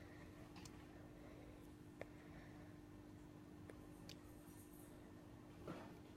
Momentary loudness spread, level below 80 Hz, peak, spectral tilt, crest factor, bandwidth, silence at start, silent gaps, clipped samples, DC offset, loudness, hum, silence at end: 5 LU; -70 dBFS; -34 dBFS; -5.5 dB/octave; 24 dB; 16 kHz; 0 s; none; under 0.1%; under 0.1%; -59 LUFS; 50 Hz at -70 dBFS; 0 s